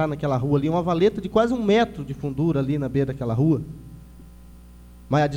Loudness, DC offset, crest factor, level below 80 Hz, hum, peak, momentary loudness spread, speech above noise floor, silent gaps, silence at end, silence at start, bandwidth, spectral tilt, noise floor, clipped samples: -23 LUFS; under 0.1%; 18 dB; -46 dBFS; 60 Hz at -45 dBFS; -6 dBFS; 7 LU; 23 dB; none; 0 s; 0 s; 9.6 kHz; -8 dB/octave; -45 dBFS; under 0.1%